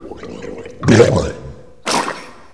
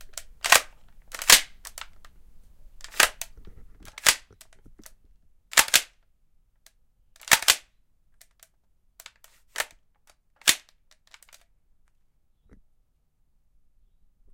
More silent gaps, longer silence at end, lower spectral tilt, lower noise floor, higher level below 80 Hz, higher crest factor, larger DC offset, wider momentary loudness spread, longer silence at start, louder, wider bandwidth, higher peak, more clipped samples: neither; second, 0.25 s vs 3.75 s; first, -5.5 dB/octave vs 2 dB/octave; second, -35 dBFS vs -67 dBFS; first, -38 dBFS vs -54 dBFS; second, 18 dB vs 30 dB; first, 0.8% vs under 0.1%; second, 21 LU vs 25 LU; second, 0 s vs 0.15 s; first, -15 LUFS vs -21 LUFS; second, 11 kHz vs 17 kHz; about the same, 0 dBFS vs 0 dBFS; first, 0.1% vs under 0.1%